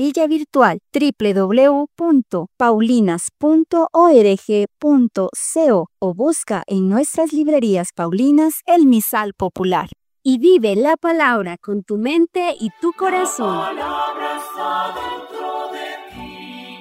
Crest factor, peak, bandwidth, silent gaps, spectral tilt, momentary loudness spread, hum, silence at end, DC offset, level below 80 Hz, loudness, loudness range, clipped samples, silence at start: 16 dB; 0 dBFS; 16 kHz; none; -5 dB/octave; 13 LU; none; 0 s; under 0.1%; -56 dBFS; -17 LUFS; 7 LU; under 0.1%; 0 s